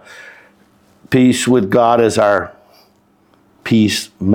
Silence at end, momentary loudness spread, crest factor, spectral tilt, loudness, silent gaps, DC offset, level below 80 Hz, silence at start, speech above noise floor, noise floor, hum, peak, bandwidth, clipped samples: 0 s; 7 LU; 14 dB; -5.5 dB/octave; -13 LUFS; none; under 0.1%; -52 dBFS; 0.1 s; 41 dB; -54 dBFS; none; -2 dBFS; 17 kHz; under 0.1%